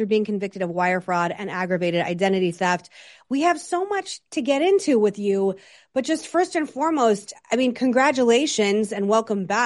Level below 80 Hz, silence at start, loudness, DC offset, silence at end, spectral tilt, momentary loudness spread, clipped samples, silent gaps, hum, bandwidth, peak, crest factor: -70 dBFS; 0 s; -22 LUFS; under 0.1%; 0 s; -4.5 dB/octave; 8 LU; under 0.1%; none; none; 11.5 kHz; -6 dBFS; 16 dB